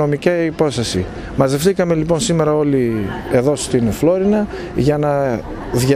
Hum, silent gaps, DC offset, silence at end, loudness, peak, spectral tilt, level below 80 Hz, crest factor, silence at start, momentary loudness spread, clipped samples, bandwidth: none; none; under 0.1%; 0 s; -17 LUFS; 0 dBFS; -6 dB/octave; -36 dBFS; 16 dB; 0 s; 6 LU; under 0.1%; 16 kHz